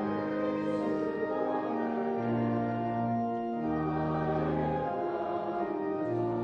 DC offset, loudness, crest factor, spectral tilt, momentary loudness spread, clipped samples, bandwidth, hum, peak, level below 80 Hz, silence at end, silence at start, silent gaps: under 0.1%; -32 LUFS; 12 dB; -9.5 dB/octave; 3 LU; under 0.1%; 6.6 kHz; none; -18 dBFS; -56 dBFS; 0 s; 0 s; none